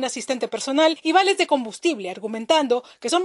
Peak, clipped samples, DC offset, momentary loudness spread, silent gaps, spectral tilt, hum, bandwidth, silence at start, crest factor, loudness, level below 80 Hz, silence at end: -4 dBFS; under 0.1%; under 0.1%; 9 LU; none; -2 dB/octave; none; 11.5 kHz; 0 s; 18 dB; -21 LUFS; -76 dBFS; 0 s